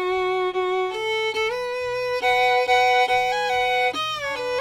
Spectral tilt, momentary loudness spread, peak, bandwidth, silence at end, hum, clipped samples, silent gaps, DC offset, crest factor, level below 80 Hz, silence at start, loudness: -2.5 dB/octave; 7 LU; -8 dBFS; 17.5 kHz; 0 s; none; under 0.1%; none; under 0.1%; 14 dB; -56 dBFS; 0 s; -21 LUFS